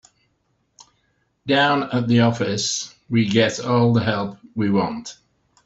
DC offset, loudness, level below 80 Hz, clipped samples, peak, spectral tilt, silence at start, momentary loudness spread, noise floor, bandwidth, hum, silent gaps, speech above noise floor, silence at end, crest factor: under 0.1%; -20 LUFS; -58 dBFS; under 0.1%; -2 dBFS; -5 dB/octave; 0.8 s; 10 LU; -68 dBFS; 8 kHz; none; none; 49 dB; 0.55 s; 20 dB